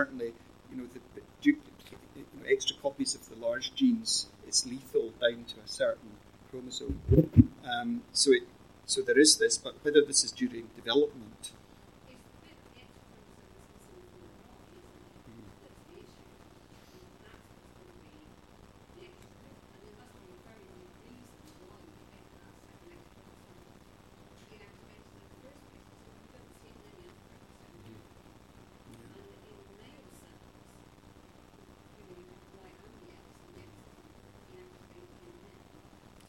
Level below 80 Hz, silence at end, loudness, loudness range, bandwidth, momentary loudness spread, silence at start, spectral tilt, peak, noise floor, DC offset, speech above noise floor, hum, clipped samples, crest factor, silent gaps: -52 dBFS; 2.7 s; -29 LUFS; 10 LU; 16.5 kHz; 30 LU; 0 s; -4 dB/octave; -6 dBFS; -57 dBFS; under 0.1%; 28 dB; 60 Hz at -60 dBFS; under 0.1%; 30 dB; none